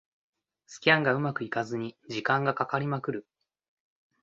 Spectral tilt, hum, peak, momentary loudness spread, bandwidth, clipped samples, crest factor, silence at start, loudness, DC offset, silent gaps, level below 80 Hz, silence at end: -5.5 dB/octave; none; -6 dBFS; 13 LU; 8 kHz; under 0.1%; 24 dB; 0.7 s; -28 LUFS; under 0.1%; none; -70 dBFS; 1 s